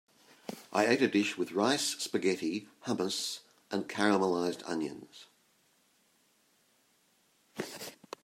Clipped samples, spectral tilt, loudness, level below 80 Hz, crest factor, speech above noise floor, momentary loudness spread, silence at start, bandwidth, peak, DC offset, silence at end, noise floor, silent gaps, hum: under 0.1%; -3.5 dB/octave; -32 LUFS; -82 dBFS; 24 dB; 39 dB; 19 LU; 0.5 s; 16 kHz; -10 dBFS; under 0.1%; 0.3 s; -70 dBFS; none; none